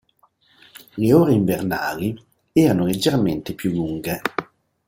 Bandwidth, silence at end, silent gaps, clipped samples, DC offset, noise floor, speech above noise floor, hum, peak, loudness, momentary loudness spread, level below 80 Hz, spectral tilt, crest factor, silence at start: 17 kHz; 0.45 s; none; under 0.1%; under 0.1%; -60 dBFS; 41 dB; none; -2 dBFS; -20 LUFS; 11 LU; -52 dBFS; -6.5 dB/octave; 20 dB; 0.95 s